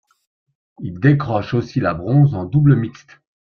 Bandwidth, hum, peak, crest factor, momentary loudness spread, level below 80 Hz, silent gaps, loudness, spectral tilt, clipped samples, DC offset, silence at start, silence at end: 6.2 kHz; none; -2 dBFS; 16 dB; 12 LU; -48 dBFS; none; -17 LUFS; -9.5 dB/octave; under 0.1%; under 0.1%; 0.8 s; 0.6 s